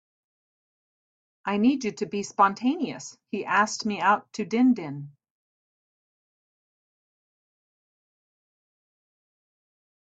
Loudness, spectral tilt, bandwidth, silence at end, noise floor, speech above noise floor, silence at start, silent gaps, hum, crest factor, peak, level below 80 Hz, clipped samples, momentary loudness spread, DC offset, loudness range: -25 LUFS; -4.5 dB/octave; 8 kHz; 5 s; under -90 dBFS; over 65 dB; 1.45 s; none; none; 22 dB; -8 dBFS; -74 dBFS; under 0.1%; 14 LU; under 0.1%; 6 LU